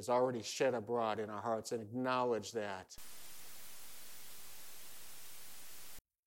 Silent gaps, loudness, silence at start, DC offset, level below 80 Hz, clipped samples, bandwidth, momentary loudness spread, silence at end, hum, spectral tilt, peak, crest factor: 6.01-6.05 s, 6.19-6.23 s; -38 LUFS; 0 s; under 0.1%; -72 dBFS; under 0.1%; 17 kHz; 17 LU; 0 s; none; -4 dB/octave; -22 dBFS; 18 dB